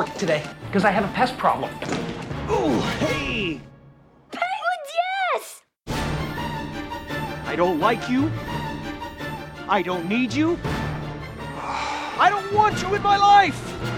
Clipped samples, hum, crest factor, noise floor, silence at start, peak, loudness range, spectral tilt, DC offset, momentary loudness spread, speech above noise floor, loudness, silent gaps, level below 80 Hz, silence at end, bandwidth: under 0.1%; none; 18 dB; -51 dBFS; 0 s; -4 dBFS; 6 LU; -5 dB/octave; under 0.1%; 12 LU; 30 dB; -23 LUFS; none; -44 dBFS; 0 s; 17.5 kHz